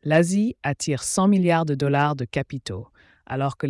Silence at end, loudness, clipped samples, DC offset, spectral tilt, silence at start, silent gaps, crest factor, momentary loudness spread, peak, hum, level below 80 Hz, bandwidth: 0 s; -22 LUFS; under 0.1%; under 0.1%; -5.5 dB/octave; 0.05 s; none; 14 dB; 14 LU; -8 dBFS; none; -56 dBFS; 12 kHz